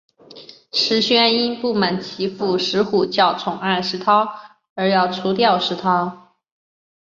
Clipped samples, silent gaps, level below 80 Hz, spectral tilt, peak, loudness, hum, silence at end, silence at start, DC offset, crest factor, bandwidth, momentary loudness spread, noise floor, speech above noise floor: under 0.1%; 4.70-4.76 s; -62 dBFS; -5 dB/octave; -2 dBFS; -18 LUFS; none; 0.8 s; 0.3 s; under 0.1%; 18 dB; 7.6 kHz; 9 LU; -43 dBFS; 24 dB